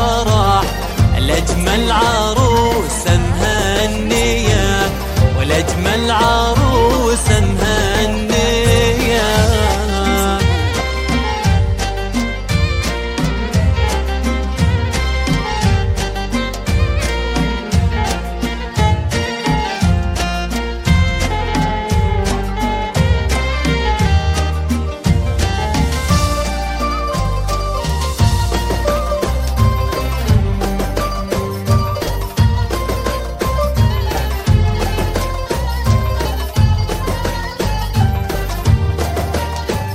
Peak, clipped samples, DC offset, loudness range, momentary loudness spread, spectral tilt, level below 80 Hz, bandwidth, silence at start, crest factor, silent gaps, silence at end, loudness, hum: 0 dBFS; under 0.1%; under 0.1%; 4 LU; 6 LU; -5 dB/octave; -20 dBFS; 16 kHz; 0 s; 14 dB; none; 0 s; -16 LUFS; none